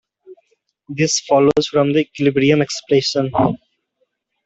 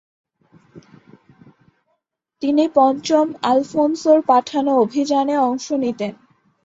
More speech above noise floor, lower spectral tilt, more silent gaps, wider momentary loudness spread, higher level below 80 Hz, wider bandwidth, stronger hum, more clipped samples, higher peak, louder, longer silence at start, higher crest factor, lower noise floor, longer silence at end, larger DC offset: about the same, 53 dB vs 56 dB; about the same, -4.5 dB/octave vs -5 dB/octave; neither; about the same, 6 LU vs 8 LU; first, -54 dBFS vs -66 dBFS; about the same, 8.2 kHz vs 7.8 kHz; neither; neither; about the same, -2 dBFS vs -2 dBFS; about the same, -16 LUFS vs -18 LUFS; second, 0.3 s vs 0.75 s; about the same, 16 dB vs 18 dB; second, -69 dBFS vs -73 dBFS; first, 0.9 s vs 0.5 s; neither